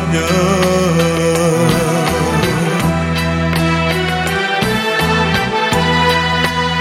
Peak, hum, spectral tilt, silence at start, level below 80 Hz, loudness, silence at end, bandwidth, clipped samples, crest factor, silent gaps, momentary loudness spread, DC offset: 0 dBFS; none; -5 dB/octave; 0 s; -32 dBFS; -14 LUFS; 0 s; 16 kHz; under 0.1%; 14 dB; none; 3 LU; under 0.1%